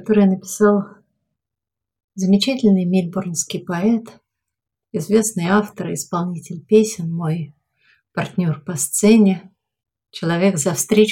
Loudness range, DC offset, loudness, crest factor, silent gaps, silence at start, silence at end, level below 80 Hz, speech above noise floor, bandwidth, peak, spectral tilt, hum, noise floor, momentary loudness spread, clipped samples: 3 LU; under 0.1%; -18 LUFS; 16 dB; 2.04-2.08 s; 0 s; 0 s; -60 dBFS; 60 dB; 17 kHz; -2 dBFS; -5.5 dB/octave; none; -78 dBFS; 12 LU; under 0.1%